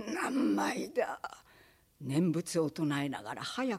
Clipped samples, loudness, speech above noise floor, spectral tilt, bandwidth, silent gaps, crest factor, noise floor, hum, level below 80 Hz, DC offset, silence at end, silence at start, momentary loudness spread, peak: under 0.1%; -33 LUFS; 30 dB; -5.5 dB/octave; 15.5 kHz; none; 16 dB; -63 dBFS; none; -72 dBFS; under 0.1%; 0 s; 0 s; 9 LU; -18 dBFS